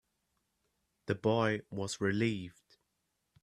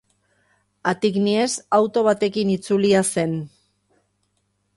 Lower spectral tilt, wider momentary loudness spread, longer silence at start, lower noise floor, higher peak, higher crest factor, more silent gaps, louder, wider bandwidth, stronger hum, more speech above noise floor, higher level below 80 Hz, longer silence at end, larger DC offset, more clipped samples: about the same, -5.5 dB/octave vs -5 dB/octave; first, 14 LU vs 8 LU; first, 1.05 s vs 0.85 s; first, -82 dBFS vs -70 dBFS; second, -16 dBFS vs -4 dBFS; about the same, 20 dB vs 18 dB; neither; second, -34 LUFS vs -20 LUFS; about the same, 12.5 kHz vs 11.5 kHz; second, none vs 50 Hz at -40 dBFS; about the same, 49 dB vs 50 dB; second, -70 dBFS vs -62 dBFS; second, 0.9 s vs 1.3 s; neither; neither